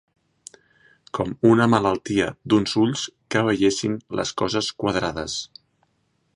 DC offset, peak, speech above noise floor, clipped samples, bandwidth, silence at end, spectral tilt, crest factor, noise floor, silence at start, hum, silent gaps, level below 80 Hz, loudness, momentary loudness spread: under 0.1%; -2 dBFS; 47 dB; under 0.1%; 11 kHz; 0.9 s; -5 dB/octave; 20 dB; -69 dBFS; 1.15 s; none; none; -52 dBFS; -22 LUFS; 11 LU